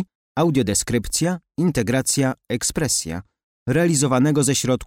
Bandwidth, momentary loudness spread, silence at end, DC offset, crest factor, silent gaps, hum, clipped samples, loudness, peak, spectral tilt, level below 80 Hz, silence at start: 16.5 kHz; 6 LU; 0 s; under 0.1%; 12 dB; 0.15-0.35 s, 3.43-3.66 s; none; under 0.1%; -20 LUFS; -8 dBFS; -4.5 dB/octave; -44 dBFS; 0 s